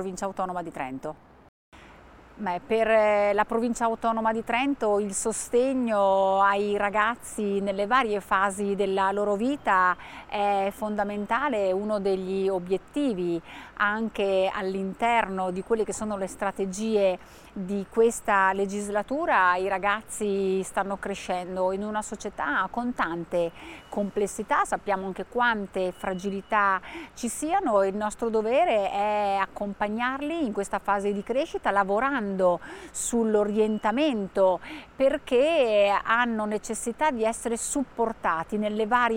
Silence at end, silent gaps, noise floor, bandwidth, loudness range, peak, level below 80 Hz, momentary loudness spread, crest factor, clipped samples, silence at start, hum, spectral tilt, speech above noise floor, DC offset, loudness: 0 s; 1.49-1.72 s; -50 dBFS; 16.5 kHz; 4 LU; -8 dBFS; -54 dBFS; 9 LU; 18 dB; under 0.1%; 0 s; none; -4.5 dB/octave; 24 dB; under 0.1%; -26 LUFS